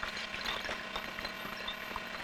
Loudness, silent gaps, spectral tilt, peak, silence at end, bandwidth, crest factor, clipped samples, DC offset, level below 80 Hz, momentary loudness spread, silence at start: -38 LUFS; none; -2.5 dB/octave; -20 dBFS; 0 s; over 20 kHz; 20 dB; under 0.1%; under 0.1%; -58 dBFS; 4 LU; 0 s